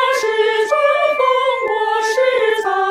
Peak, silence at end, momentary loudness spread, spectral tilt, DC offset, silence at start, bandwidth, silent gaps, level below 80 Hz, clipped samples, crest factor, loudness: -2 dBFS; 0 s; 3 LU; -0.5 dB/octave; under 0.1%; 0 s; 16 kHz; none; -60 dBFS; under 0.1%; 14 dB; -15 LUFS